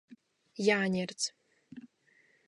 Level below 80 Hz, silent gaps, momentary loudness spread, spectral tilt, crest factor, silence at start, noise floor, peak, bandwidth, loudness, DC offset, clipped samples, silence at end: -78 dBFS; none; 24 LU; -4 dB/octave; 22 dB; 0.1 s; -68 dBFS; -14 dBFS; 11 kHz; -31 LUFS; under 0.1%; under 0.1%; 0.7 s